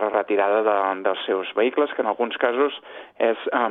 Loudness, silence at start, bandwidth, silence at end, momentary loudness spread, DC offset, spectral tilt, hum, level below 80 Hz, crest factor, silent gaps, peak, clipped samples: -22 LUFS; 0 s; 4 kHz; 0 s; 5 LU; under 0.1%; -6.5 dB/octave; none; -74 dBFS; 18 dB; none; -4 dBFS; under 0.1%